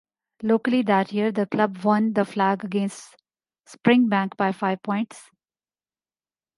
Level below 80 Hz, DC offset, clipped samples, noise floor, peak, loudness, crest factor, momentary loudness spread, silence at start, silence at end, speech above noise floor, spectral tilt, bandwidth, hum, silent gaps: -72 dBFS; under 0.1%; under 0.1%; under -90 dBFS; -4 dBFS; -23 LUFS; 20 dB; 9 LU; 0.4 s; 1.35 s; over 68 dB; -6.5 dB/octave; 11.5 kHz; none; none